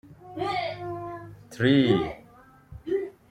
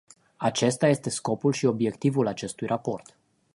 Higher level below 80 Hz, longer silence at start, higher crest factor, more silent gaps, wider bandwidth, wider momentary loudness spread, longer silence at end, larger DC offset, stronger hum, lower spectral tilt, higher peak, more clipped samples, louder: first, -56 dBFS vs -66 dBFS; second, 0.05 s vs 0.4 s; about the same, 20 dB vs 20 dB; neither; about the same, 11 kHz vs 11.5 kHz; first, 21 LU vs 7 LU; second, 0.2 s vs 0.55 s; neither; neither; first, -7 dB/octave vs -5.5 dB/octave; about the same, -8 dBFS vs -8 dBFS; neither; about the same, -26 LUFS vs -26 LUFS